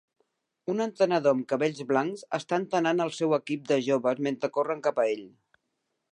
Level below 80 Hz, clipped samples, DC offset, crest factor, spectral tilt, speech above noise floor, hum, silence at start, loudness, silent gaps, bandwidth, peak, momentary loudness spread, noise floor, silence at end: -82 dBFS; under 0.1%; under 0.1%; 18 dB; -5.5 dB/octave; 53 dB; none; 0.65 s; -27 LUFS; none; 10.5 kHz; -10 dBFS; 6 LU; -80 dBFS; 0.85 s